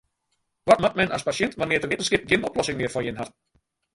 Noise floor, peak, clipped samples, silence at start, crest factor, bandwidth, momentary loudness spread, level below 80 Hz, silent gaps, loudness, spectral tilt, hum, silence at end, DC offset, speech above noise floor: -75 dBFS; -4 dBFS; under 0.1%; 0.65 s; 22 dB; 11.5 kHz; 12 LU; -52 dBFS; none; -23 LUFS; -4 dB/octave; none; 0.65 s; under 0.1%; 52 dB